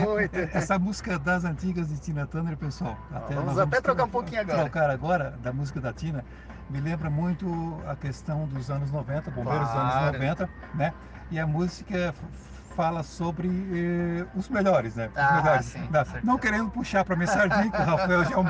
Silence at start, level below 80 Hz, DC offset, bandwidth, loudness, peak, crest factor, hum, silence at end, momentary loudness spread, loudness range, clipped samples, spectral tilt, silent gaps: 0 s; -44 dBFS; under 0.1%; 9.4 kHz; -27 LUFS; -10 dBFS; 18 dB; none; 0 s; 11 LU; 6 LU; under 0.1%; -7 dB/octave; none